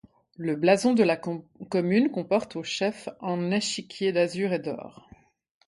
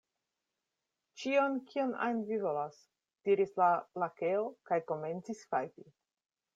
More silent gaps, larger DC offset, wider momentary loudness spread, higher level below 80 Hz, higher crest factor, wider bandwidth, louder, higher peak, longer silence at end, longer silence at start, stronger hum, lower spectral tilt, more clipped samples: neither; neither; about the same, 13 LU vs 11 LU; first, -68 dBFS vs -84 dBFS; about the same, 20 dB vs 20 dB; first, 11.5 kHz vs 7.8 kHz; first, -26 LUFS vs -34 LUFS; first, -6 dBFS vs -16 dBFS; about the same, 0.75 s vs 0.75 s; second, 0.4 s vs 1.15 s; neither; about the same, -5 dB/octave vs -6 dB/octave; neither